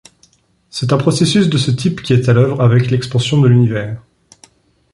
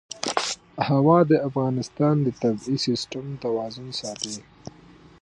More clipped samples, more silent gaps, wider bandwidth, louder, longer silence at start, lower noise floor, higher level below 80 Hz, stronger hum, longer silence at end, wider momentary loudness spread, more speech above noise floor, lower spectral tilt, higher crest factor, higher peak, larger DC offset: neither; neither; about the same, 11.5 kHz vs 11 kHz; first, -13 LUFS vs -24 LUFS; first, 0.75 s vs 0.15 s; first, -54 dBFS vs -50 dBFS; first, -46 dBFS vs -60 dBFS; neither; first, 0.95 s vs 0.8 s; second, 11 LU vs 14 LU; first, 41 dB vs 27 dB; about the same, -6.5 dB/octave vs -5.5 dB/octave; second, 12 dB vs 20 dB; about the same, -2 dBFS vs -4 dBFS; neither